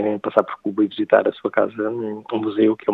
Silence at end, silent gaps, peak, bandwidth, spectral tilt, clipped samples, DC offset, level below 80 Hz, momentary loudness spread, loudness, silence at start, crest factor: 0 s; none; 0 dBFS; 4.3 kHz; -8.5 dB/octave; under 0.1%; under 0.1%; -74 dBFS; 8 LU; -21 LUFS; 0 s; 20 dB